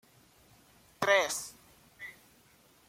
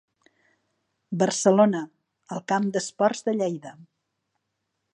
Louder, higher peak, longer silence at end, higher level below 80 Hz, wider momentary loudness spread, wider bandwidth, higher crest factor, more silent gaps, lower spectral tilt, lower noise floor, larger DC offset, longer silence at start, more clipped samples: second, -29 LUFS vs -24 LUFS; second, -12 dBFS vs -4 dBFS; second, 0.75 s vs 1.1 s; first, -72 dBFS vs -78 dBFS; first, 21 LU vs 17 LU; first, 16.5 kHz vs 11 kHz; about the same, 24 dB vs 22 dB; neither; second, -1.5 dB/octave vs -5 dB/octave; second, -63 dBFS vs -79 dBFS; neither; about the same, 1 s vs 1.1 s; neither